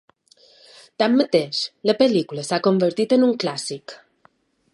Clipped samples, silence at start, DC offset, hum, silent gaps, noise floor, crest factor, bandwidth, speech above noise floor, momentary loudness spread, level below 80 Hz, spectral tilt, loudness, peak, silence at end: under 0.1%; 1 s; under 0.1%; none; none; -60 dBFS; 18 dB; 11.5 kHz; 40 dB; 11 LU; -72 dBFS; -5 dB/octave; -20 LUFS; -4 dBFS; 0.75 s